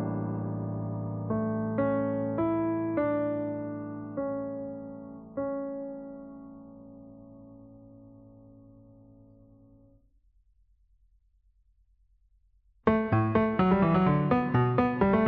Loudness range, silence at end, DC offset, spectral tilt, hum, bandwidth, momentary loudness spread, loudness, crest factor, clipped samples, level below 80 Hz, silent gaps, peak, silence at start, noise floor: 22 LU; 0 s; under 0.1%; -8 dB/octave; none; 4.9 kHz; 22 LU; -29 LUFS; 22 dB; under 0.1%; -56 dBFS; none; -8 dBFS; 0 s; -67 dBFS